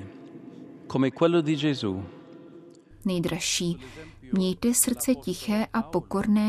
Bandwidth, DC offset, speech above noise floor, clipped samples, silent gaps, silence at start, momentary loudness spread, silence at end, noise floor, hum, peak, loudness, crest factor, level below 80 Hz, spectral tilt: 14.5 kHz; under 0.1%; 24 dB; under 0.1%; none; 0 s; 23 LU; 0 s; -49 dBFS; none; -6 dBFS; -26 LUFS; 20 dB; -54 dBFS; -4.5 dB/octave